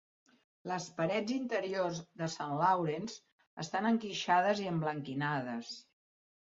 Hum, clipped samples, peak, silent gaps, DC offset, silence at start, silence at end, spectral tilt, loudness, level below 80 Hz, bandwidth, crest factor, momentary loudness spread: none; under 0.1%; -16 dBFS; 3.32-3.38 s, 3.47-3.57 s; under 0.1%; 0.65 s; 0.7 s; -4 dB/octave; -34 LUFS; -78 dBFS; 7.6 kHz; 18 dB; 15 LU